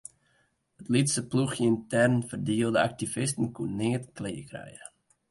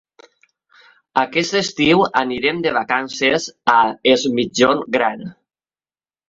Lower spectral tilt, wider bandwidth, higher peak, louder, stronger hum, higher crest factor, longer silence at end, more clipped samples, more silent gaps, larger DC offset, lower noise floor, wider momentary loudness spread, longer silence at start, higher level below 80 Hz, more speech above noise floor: about the same, -5 dB/octave vs -4 dB/octave; first, 11.5 kHz vs 7.8 kHz; second, -10 dBFS vs -2 dBFS; second, -28 LUFS vs -17 LUFS; neither; about the same, 18 dB vs 18 dB; second, 0.45 s vs 0.95 s; neither; neither; neither; second, -70 dBFS vs under -90 dBFS; first, 19 LU vs 6 LU; second, 0.8 s vs 1.15 s; second, -62 dBFS vs -56 dBFS; second, 43 dB vs over 73 dB